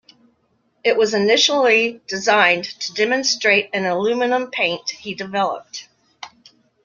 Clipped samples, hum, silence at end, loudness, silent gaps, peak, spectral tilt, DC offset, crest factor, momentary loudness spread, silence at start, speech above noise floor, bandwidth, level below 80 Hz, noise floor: under 0.1%; none; 0.6 s; -18 LUFS; none; 0 dBFS; -2.5 dB/octave; under 0.1%; 18 dB; 18 LU; 0.85 s; 46 dB; 7.4 kHz; -66 dBFS; -64 dBFS